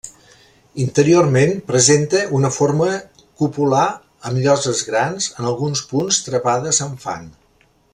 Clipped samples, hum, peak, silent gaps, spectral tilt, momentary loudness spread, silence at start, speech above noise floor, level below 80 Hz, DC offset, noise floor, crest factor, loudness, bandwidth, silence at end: under 0.1%; none; 0 dBFS; none; -4.5 dB/octave; 14 LU; 0.05 s; 40 dB; -54 dBFS; under 0.1%; -57 dBFS; 18 dB; -17 LUFS; 12 kHz; 0.65 s